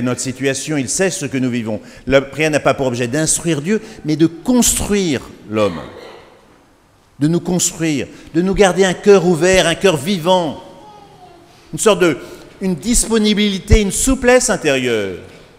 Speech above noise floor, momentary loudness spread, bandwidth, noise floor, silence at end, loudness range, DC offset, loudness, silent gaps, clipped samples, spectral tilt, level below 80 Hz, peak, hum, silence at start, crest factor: 36 dB; 11 LU; 16 kHz; -51 dBFS; 0.25 s; 5 LU; under 0.1%; -15 LUFS; none; under 0.1%; -4 dB/octave; -30 dBFS; 0 dBFS; none; 0 s; 16 dB